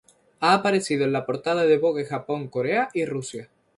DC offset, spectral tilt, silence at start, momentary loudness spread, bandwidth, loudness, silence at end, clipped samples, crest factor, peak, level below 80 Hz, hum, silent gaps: under 0.1%; -5 dB/octave; 0.4 s; 9 LU; 11.5 kHz; -23 LUFS; 0.35 s; under 0.1%; 18 dB; -6 dBFS; -68 dBFS; none; none